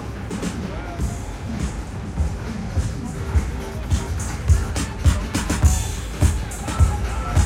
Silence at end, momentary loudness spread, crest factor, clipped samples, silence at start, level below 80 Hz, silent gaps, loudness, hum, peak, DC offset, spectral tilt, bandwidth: 0 s; 9 LU; 18 dB; under 0.1%; 0 s; -24 dBFS; none; -24 LUFS; none; -4 dBFS; under 0.1%; -5.5 dB/octave; 16 kHz